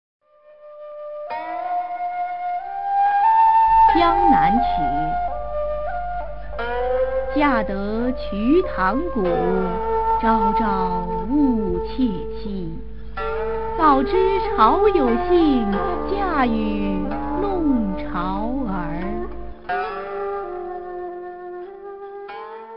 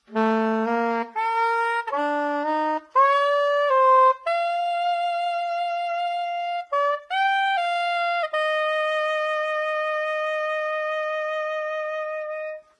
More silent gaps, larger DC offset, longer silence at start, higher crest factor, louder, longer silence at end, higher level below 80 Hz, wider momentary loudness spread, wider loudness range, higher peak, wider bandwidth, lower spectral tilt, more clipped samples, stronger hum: neither; first, 3% vs under 0.1%; about the same, 0.2 s vs 0.1 s; about the same, 18 dB vs 16 dB; first, -20 LUFS vs -23 LUFS; second, 0 s vs 0.2 s; first, -36 dBFS vs -86 dBFS; first, 17 LU vs 8 LU; first, 9 LU vs 4 LU; first, -2 dBFS vs -8 dBFS; second, 5.6 kHz vs 10.5 kHz; first, -9.5 dB/octave vs -4 dB/octave; neither; neither